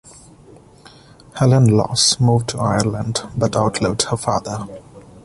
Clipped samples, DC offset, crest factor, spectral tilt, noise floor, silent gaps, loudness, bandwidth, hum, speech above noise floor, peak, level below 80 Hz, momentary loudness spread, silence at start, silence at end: under 0.1%; under 0.1%; 18 dB; -5 dB/octave; -45 dBFS; none; -17 LUFS; 11.5 kHz; none; 28 dB; -2 dBFS; -44 dBFS; 15 LU; 0.05 s; 0.05 s